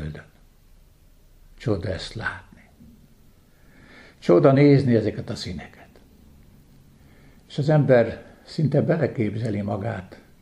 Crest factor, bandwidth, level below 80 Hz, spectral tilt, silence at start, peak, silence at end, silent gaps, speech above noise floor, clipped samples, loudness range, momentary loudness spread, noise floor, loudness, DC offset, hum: 20 dB; 10 kHz; -50 dBFS; -8 dB/octave; 0 s; -4 dBFS; 0.3 s; none; 33 dB; under 0.1%; 12 LU; 19 LU; -53 dBFS; -22 LUFS; under 0.1%; none